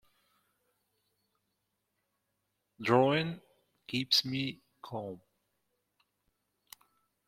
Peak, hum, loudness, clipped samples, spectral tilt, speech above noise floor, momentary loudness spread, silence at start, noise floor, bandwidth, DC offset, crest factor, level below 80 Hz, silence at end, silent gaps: -10 dBFS; 50 Hz at -70 dBFS; -31 LUFS; under 0.1%; -4.5 dB/octave; 51 dB; 21 LU; 2.8 s; -82 dBFS; 16.5 kHz; under 0.1%; 26 dB; -74 dBFS; 2.1 s; none